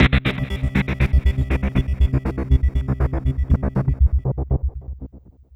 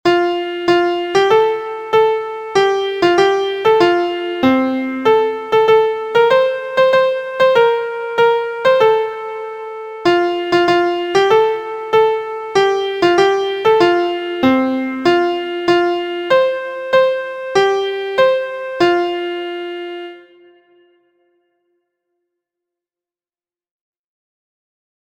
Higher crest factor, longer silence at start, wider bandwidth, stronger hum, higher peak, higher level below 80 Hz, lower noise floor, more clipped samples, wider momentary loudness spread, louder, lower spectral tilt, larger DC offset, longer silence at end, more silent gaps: about the same, 16 dB vs 16 dB; about the same, 0 s vs 0.05 s; second, 5.6 kHz vs 14.5 kHz; neither; about the same, -2 dBFS vs 0 dBFS; first, -22 dBFS vs -56 dBFS; second, -43 dBFS vs under -90 dBFS; neither; second, 5 LU vs 10 LU; second, -21 LUFS vs -15 LUFS; first, -8 dB/octave vs -4.5 dB/octave; neither; second, 0.35 s vs 4.85 s; neither